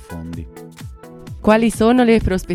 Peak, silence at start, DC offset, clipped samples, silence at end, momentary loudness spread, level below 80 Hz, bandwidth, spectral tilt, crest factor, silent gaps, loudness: 0 dBFS; 0 s; under 0.1%; under 0.1%; 0 s; 22 LU; -34 dBFS; 14.5 kHz; -6 dB/octave; 18 dB; none; -15 LUFS